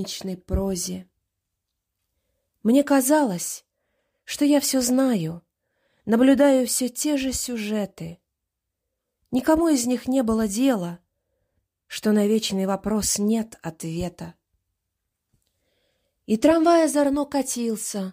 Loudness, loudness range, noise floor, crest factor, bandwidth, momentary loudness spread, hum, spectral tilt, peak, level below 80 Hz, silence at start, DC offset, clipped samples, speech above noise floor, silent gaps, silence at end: -22 LUFS; 4 LU; -82 dBFS; 18 dB; 16 kHz; 15 LU; none; -4.5 dB/octave; -6 dBFS; -46 dBFS; 0 s; under 0.1%; under 0.1%; 61 dB; none; 0 s